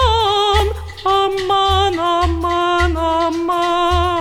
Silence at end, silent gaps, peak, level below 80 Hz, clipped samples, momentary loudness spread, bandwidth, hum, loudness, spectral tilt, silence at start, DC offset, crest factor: 0 s; none; -2 dBFS; -26 dBFS; under 0.1%; 4 LU; 15 kHz; none; -16 LUFS; -5 dB/octave; 0 s; under 0.1%; 14 dB